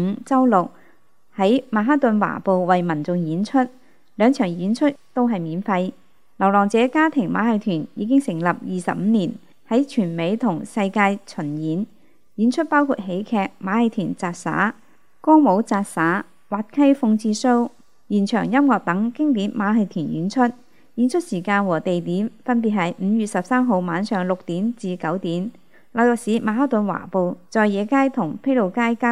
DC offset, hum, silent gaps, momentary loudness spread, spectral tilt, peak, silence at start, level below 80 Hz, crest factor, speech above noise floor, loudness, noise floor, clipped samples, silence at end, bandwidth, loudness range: 0.4%; none; none; 8 LU; -6.5 dB/octave; -2 dBFS; 0 s; -70 dBFS; 18 dB; 39 dB; -20 LUFS; -59 dBFS; under 0.1%; 0 s; 12 kHz; 3 LU